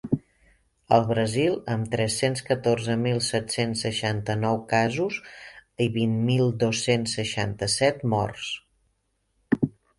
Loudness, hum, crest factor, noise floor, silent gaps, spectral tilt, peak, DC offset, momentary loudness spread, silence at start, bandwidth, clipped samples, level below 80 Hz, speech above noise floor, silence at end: -25 LUFS; none; 20 dB; -72 dBFS; none; -5 dB/octave; -4 dBFS; under 0.1%; 7 LU; 0.05 s; 11.5 kHz; under 0.1%; -54 dBFS; 48 dB; 0.3 s